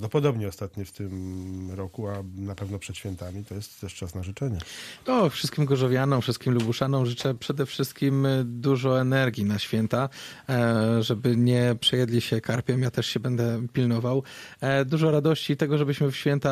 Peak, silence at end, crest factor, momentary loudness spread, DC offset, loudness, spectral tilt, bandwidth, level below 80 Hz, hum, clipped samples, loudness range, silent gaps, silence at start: -10 dBFS; 0 s; 16 dB; 13 LU; under 0.1%; -26 LUFS; -6.5 dB/octave; 15 kHz; -56 dBFS; none; under 0.1%; 10 LU; none; 0 s